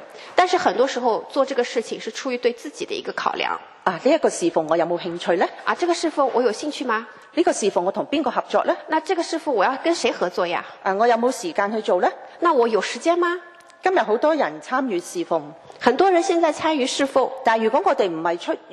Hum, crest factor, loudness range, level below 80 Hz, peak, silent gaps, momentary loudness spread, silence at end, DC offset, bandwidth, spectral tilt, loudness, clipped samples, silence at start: none; 22 dB; 2 LU; -70 dBFS; 0 dBFS; none; 7 LU; 0 s; under 0.1%; 12.5 kHz; -3.5 dB/octave; -21 LUFS; under 0.1%; 0 s